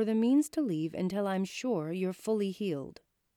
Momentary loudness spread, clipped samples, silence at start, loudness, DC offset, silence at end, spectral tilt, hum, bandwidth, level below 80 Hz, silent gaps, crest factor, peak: 9 LU; under 0.1%; 0 s; -32 LUFS; under 0.1%; 0.45 s; -6.5 dB/octave; none; 16.5 kHz; -74 dBFS; none; 12 dB; -18 dBFS